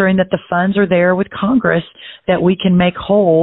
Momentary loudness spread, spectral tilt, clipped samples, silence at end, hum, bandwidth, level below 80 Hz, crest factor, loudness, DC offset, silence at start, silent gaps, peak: 6 LU; -12.5 dB/octave; under 0.1%; 0 s; none; 4.1 kHz; -44 dBFS; 12 dB; -14 LUFS; under 0.1%; 0 s; none; -2 dBFS